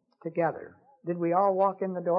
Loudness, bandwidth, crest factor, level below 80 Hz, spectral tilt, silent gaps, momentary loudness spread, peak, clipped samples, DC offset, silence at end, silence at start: -28 LUFS; 5.2 kHz; 16 dB; -82 dBFS; -12 dB/octave; none; 14 LU; -12 dBFS; under 0.1%; under 0.1%; 0 s; 0.25 s